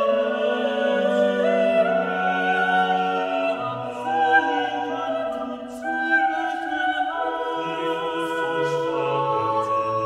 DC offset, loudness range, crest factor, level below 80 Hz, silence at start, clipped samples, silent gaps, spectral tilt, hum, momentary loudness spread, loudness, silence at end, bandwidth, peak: under 0.1%; 3 LU; 16 dB; -64 dBFS; 0 s; under 0.1%; none; -5.5 dB/octave; none; 7 LU; -23 LUFS; 0 s; 12.5 kHz; -6 dBFS